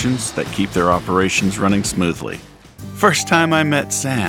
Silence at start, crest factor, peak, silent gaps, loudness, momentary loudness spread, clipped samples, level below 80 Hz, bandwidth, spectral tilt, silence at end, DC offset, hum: 0 s; 16 dB; 0 dBFS; none; -17 LUFS; 13 LU; under 0.1%; -42 dBFS; 18 kHz; -4 dB/octave; 0 s; under 0.1%; none